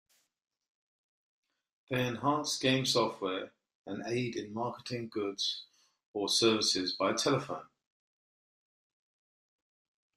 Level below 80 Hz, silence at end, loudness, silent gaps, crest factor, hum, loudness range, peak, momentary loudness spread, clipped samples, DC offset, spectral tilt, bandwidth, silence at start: -74 dBFS; 2.5 s; -32 LUFS; 3.75-3.85 s, 6.06-6.14 s; 22 dB; none; 5 LU; -14 dBFS; 15 LU; under 0.1%; under 0.1%; -3.5 dB/octave; 14.5 kHz; 1.9 s